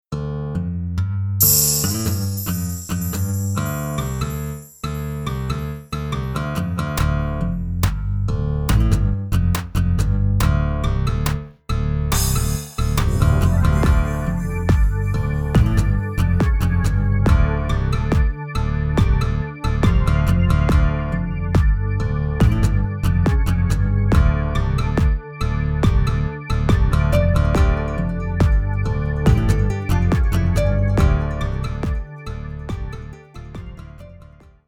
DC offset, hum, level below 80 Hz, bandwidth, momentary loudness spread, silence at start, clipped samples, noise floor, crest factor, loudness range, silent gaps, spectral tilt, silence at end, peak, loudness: under 0.1%; none; -22 dBFS; over 20 kHz; 9 LU; 0.1 s; under 0.1%; -45 dBFS; 18 dB; 5 LU; none; -5.5 dB/octave; 0.5 s; 0 dBFS; -20 LUFS